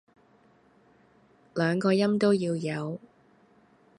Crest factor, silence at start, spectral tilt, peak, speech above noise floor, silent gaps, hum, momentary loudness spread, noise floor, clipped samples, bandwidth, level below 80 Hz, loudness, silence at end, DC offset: 18 dB; 1.55 s; -7 dB/octave; -12 dBFS; 36 dB; none; none; 14 LU; -61 dBFS; under 0.1%; 11 kHz; -70 dBFS; -27 LUFS; 1 s; under 0.1%